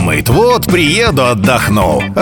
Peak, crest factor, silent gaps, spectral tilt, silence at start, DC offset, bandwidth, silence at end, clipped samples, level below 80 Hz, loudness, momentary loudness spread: 0 dBFS; 10 dB; none; -5 dB/octave; 0 s; under 0.1%; 19.5 kHz; 0 s; under 0.1%; -28 dBFS; -10 LUFS; 2 LU